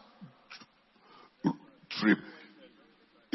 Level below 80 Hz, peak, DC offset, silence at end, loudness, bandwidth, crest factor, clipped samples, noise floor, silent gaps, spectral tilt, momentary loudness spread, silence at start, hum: -78 dBFS; -12 dBFS; under 0.1%; 1 s; -32 LUFS; 5.8 kHz; 24 dB; under 0.1%; -64 dBFS; none; -4 dB/octave; 26 LU; 0.2 s; none